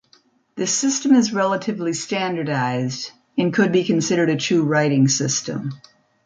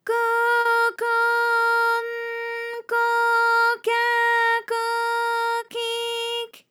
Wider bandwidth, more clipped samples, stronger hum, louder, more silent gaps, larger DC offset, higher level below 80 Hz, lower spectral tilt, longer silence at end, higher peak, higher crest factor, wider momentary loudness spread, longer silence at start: second, 9.6 kHz vs 18 kHz; neither; neither; about the same, -20 LUFS vs -21 LUFS; neither; neither; first, -64 dBFS vs under -90 dBFS; first, -4.5 dB/octave vs 1 dB/octave; first, 0.5 s vs 0.15 s; first, -4 dBFS vs -10 dBFS; about the same, 16 dB vs 12 dB; about the same, 10 LU vs 9 LU; first, 0.55 s vs 0.05 s